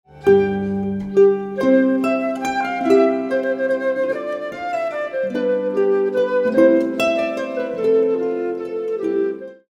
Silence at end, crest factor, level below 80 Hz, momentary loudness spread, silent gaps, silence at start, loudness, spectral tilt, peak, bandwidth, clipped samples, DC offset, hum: 0.15 s; 16 dB; -56 dBFS; 9 LU; none; 0.15 s; -19 LUFS; -6.5 dB/octave; -2 dBFS; 12.5 kHz; under 0.1%; under 0.1%; none